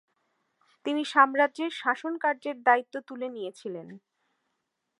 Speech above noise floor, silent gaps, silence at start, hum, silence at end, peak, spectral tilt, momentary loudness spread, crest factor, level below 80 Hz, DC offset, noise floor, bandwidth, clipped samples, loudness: 53 dB; none; 0.85 s; none; 1 s; -6 dBFS; -4 dB/octave; 17 LU; 24 dB; under -90 dBFS; under 0.1%; -81 dBFS; 11.5 kHz; under 0.1%; -27 LUFS